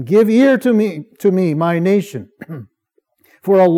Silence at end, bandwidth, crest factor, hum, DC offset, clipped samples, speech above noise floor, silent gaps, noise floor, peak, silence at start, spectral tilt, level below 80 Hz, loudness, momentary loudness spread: 0 s; 16 kHz; 14 dB; none; under 0.1%; under 0.1%; 50 dB; none; -64 dBFS; -2 dBFS; 0 s; -7.5 dB/octave; -74 dBFS; -14 LUFS; 21 LU